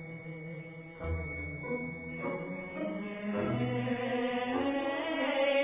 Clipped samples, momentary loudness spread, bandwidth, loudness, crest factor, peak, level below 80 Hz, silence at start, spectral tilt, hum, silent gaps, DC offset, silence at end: under 0.1%; 11 LU; 3.8 kHz; -35 LUFS; 16 dB; -18 dBFS; -50 dBFS; 0 s; -4.5 dB/octave; none; none; under 0.1%; 0 s